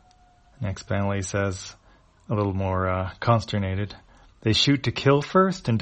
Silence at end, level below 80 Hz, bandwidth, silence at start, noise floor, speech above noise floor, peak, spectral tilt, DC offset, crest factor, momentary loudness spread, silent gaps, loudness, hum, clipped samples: 0 s; -50 dBFS; 8.4 kHz; 0.6 s; -56 dBFS; 33 dB; -4 dBFS; -5.5 dB/octave; under 0.1%; 20 dB; 13 LU; none; -24 LUFS; none; under 0.1%